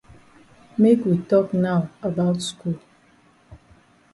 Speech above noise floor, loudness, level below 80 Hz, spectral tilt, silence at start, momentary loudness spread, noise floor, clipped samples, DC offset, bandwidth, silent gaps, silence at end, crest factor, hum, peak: 36 dB; -21 LUFS; -58 dBFS; -7 dB/octave; 0.8 s; 13 LU; -56 dBFS; under 0.1%; under 0.1%; 11.5 kHz; none; 0.6 s; 18 dB; none; -6 dBFS